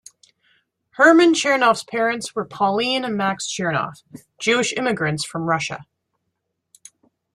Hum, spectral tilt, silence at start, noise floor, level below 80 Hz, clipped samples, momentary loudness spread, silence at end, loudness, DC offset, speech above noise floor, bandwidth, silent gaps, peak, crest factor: none; -4 dB/octave; 1 s; -76 dBFS; -64 dBFS; under 0.1%; 12 LU; 1.5 s; -19 LUFS; under 0.1%; 57 dB; 12.5 kHz; none; -2 dBFS; 20 dB